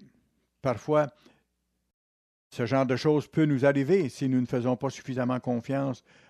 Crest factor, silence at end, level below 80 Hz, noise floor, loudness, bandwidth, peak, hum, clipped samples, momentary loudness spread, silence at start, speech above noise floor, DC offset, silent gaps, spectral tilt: 18 dB; 0.3 s; -68 dBFS; -77 dBFS; -27 LUFS; 12.5 kHz; -10 dBFS; none; under 0.1%; 10 LU; 0.65 s; 50 dB; under 0.1%; 1.94-2.50 s; -7.5 dB/octave